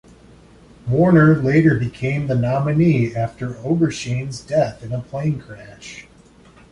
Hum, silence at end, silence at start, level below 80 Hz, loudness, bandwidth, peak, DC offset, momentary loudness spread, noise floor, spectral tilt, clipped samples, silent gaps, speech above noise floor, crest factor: none; 0.7 s; 0.85 s; -46 dBFS; -18 LUFS; 10.5 kHz; -2 dBFS; under 0.1%; 21 LU; -48 dBFS; -7.5 dB/octave; under 0.1%; none; 30 dB; 16 dB